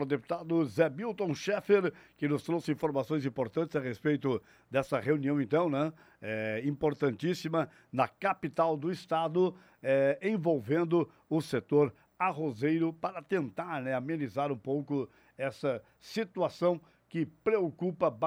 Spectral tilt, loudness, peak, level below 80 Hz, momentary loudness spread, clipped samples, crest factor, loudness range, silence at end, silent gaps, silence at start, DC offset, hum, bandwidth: -7 dB/octave; -32 LUFS; -14 dBFS; -70 dBFS; 8 LU; under 0.1%; 18 dB; 4 LU; 0 s; none; 0 s; under 0.1%; none; over 20 kHz